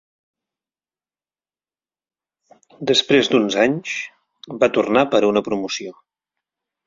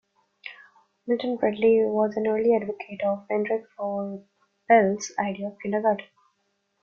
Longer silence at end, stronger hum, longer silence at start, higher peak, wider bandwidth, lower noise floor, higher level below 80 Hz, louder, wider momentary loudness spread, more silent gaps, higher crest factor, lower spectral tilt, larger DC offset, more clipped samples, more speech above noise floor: first, 0.95 s vs 0.8 s; neither; first, 2.8 s vs 0.45 s; about the same, -2 dBFS vs -4 dBFS; about the same, 7.6 kHz vs 7.2 kHz; first, under -90 dBFS vs -74 dBFS; first, -60 dBFS vs -68 dBFS; first, -18 LUFS vs -25 LUFS; second, 13 LU vs 19 LU; neither; about the same, 20 dB vs 20 dB; second, -4 dB/octave vs -5.5 dB/octave; neither; neither; first, over 72 dB vs 50 dB